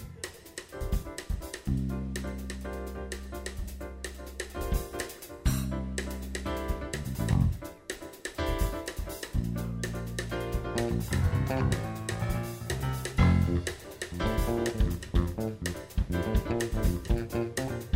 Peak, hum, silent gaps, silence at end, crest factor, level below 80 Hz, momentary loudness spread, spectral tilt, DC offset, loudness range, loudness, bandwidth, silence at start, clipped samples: -12 dBFS; none; none; 0 s; 20 dB; -36 dBFS; 11 LU; -6 dB/octave; under 0.1%; 7 LU; -33 LUFS; 16 kHz; 0 s; under 0.1%